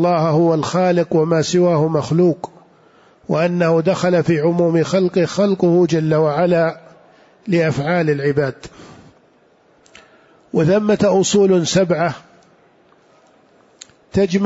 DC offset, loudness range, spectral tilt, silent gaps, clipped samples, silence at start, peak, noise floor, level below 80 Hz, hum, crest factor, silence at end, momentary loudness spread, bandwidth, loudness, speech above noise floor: under 0.1%; 5 LU; -6 dB/octave; none; under 0.1%; 0 s; -4 dBFS; -54 dBFS; -54 dBFS; none; 12 dB; 0 s; 8 LU; 8 kHz; -16 LUFS; 39 dB